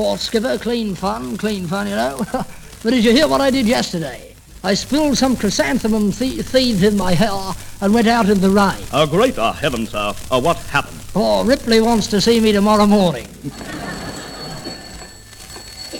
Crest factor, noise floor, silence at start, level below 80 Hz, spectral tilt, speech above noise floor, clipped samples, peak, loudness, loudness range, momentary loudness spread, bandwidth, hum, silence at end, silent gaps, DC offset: 16 dB; -37 dBFS; 0 s; -38 dBFS; -5 dB/octave; 21 dB; under 0.1%; 0 dBFS; -17 LUFS; 3 LU; 16 LU; 18.5 kHz; none; 0 s; none; under 0.1%